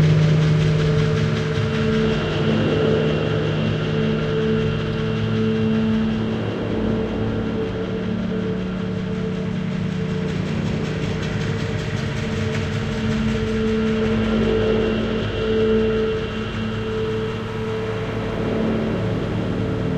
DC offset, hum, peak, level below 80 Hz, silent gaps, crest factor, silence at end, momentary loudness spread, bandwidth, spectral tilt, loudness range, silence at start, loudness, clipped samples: under 0.1%; none; -6 dBFS; -36 dBFS; none; 14 dB; 0 s; 6 LU; 8.6 kHz; -7.5 dB/octave; 4 LU; 0 s; -22 LUFS; under 0.1%